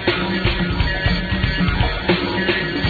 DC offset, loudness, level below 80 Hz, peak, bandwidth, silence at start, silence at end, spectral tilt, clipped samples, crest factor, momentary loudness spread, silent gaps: under 0.1%; -19 LUFS; -26 dBFS; -2 dBFS; 4.9 kHz; 0 s; 0 s; -7.5 dB/octave; under 0.1%; 16 dB; 2 LU; none